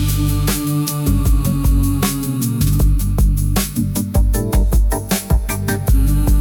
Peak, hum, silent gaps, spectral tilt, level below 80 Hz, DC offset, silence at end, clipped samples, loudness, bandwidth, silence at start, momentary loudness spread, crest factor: -4 dBFS; none; none; -5.5 dB/octave; -18 dBFS; under 0.1%; 0 s; under 0.1%; -17 LUFS; 18 kHz; 0 s; 3 LU; 12 dB